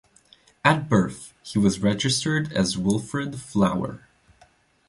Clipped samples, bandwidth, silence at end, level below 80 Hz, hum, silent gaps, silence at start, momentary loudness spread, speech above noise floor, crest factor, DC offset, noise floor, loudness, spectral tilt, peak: under 0.1%; 11.5 kHz; 0.9 s; -52 dBFS; none; none; 0.65 s; 9 LU; 36 dB; 22 dB; under 0.1%; -59 dBFS; -23 LUFS; -5 dB/octave; -2 dBFS